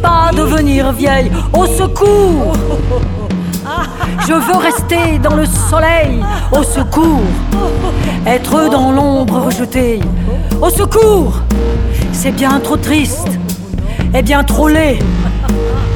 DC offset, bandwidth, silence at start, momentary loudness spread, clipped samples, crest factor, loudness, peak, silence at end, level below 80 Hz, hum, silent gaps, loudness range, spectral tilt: under 0.1%; 20 kHz; 0 s; 7 LU; under 0.1%; 10 dB; -12 LUFS; 0 dBFS; 0 s; -18 dBFS; none; none; 2 LU; -5.5 dB/octave